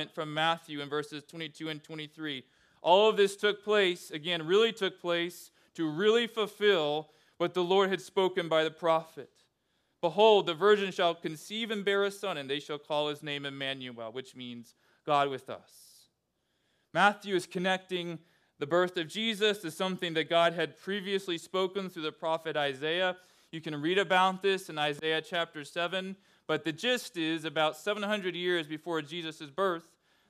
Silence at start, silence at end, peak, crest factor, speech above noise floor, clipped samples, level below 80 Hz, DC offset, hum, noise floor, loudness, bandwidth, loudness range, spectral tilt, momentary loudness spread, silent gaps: 0 s; 0.5 s; -10 dBFS; 22 dB; 48 dB; under 0.1%; -86 dBFS; under 0.1%; none; -79 dBFS; -30 LUFS; 14.5 kHz; 5 LU; -4.5 dB/octave; 14 LU; none